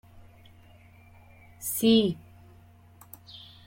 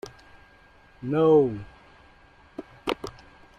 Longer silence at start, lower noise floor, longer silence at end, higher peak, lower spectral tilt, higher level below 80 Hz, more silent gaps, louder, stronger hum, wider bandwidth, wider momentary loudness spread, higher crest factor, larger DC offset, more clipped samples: first, 1.6 s vs 0.05 s; about the same, -54 dBFS vs -55 dBFS; second, 0.3 s vs 0.45 s; second, -12 dBFS vs -8 dBFS; second, -4.5 dB/octave vs -7.5 dB/octave; second, -62 dBFS vs -56 dBFS; neither; about the same, -25 LUFS vs -24 LUFS; neither; first, 16.5 kHz vs 11.5 kHz; about the same, 26 LU vs 25 LU; about the same, 20 dB vs 20 dB; neither; neither